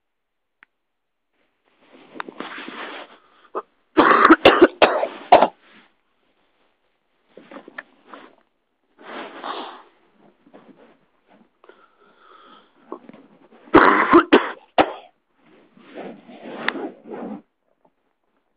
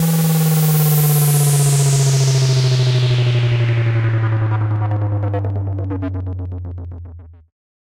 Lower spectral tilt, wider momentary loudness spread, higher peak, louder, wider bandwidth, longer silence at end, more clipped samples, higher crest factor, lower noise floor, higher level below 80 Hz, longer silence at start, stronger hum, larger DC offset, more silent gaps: about the same, -6.5 dB/octave vs -5.5 dB/octave; first, 26 LU vs 12 LU; first, 0 dBFS vs -6 dBFS; about the same, -16 LUFS vs -16 LUFS; second, 5.2 kHz vs 16.5 kHz; first, 1.2 s vs 0.65 s; neither; first, 22 dB vs 10 dB; first, -80 dBFS vs -36 dBFS; second, -56 dBFS vs -44 dBFS; first, 2.4 s vs 0 s; neither; neither; neither